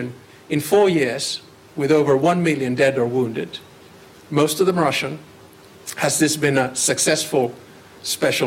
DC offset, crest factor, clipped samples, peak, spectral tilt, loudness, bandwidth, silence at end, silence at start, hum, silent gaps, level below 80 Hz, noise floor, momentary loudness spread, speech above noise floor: under 0.1%; 14 dB; under 0.1%; -6 dBFS; -4 dB/octave; -19 LUFS; 16.5 kHz; 0 s; 0 s; none; none; -60 dBFS; -45 dBFS; 15 LU; 26 dB